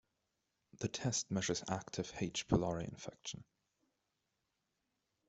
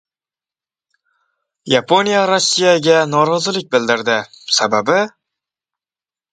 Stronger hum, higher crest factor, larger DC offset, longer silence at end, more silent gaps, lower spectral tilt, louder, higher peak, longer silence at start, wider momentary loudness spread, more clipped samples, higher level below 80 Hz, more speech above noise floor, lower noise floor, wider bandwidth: neither; first, 26 dB vs 16 dB; neither; first, 1.85 s vs 1.25 s; neither; first, -4.5 dB/octave vs -3 dB/octave; second, -40 LUFS vs -15 LUFS; second, -16 dBFS vs 0 dBFS; second, 0.75 s vs 1.65 s; first, 12 LU vs 5 LU; neither; about the same, -62 dBFS vs -62 dBFS; second, 47 dB vs over 75 dB; second, -86 dBFS vs under -90 dBFS; second, 8.2 kHz vs 9.4 kHz